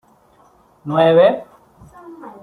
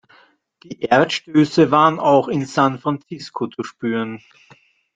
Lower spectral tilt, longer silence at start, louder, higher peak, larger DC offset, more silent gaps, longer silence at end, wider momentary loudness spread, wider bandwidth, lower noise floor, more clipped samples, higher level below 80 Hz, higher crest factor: first, -8 dB/octave vs -6 dB/octave; first, 0.85 s vs 0.7 s; first, -15 LUFS vs -18 LUFS; about the same, -2 dBFS vs 0 dBFS; neither; neither; second, 0.15 s vs 0.8 s; first, 26 LU vs 15 LU; first, 10.5 kHz vs 7.8 kHz; about the same, -52 dBFS vs -54 dBFS; neither; about the same, -58 dBFS vs -62 dBFS; about the same, 16 dB vs 18 dB